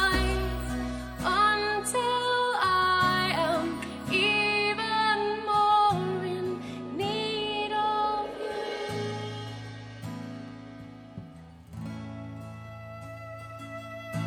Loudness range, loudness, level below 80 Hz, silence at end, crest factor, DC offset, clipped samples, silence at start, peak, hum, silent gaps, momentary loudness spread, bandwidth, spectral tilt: 16 LU; -27 LUFS; -44 dBFS; 0 s; 16 dB; under 0.1%; under 0.1%; 0 s; -12 dBFS; none; none; 19 LU; 19 kHz; -4 dB/octave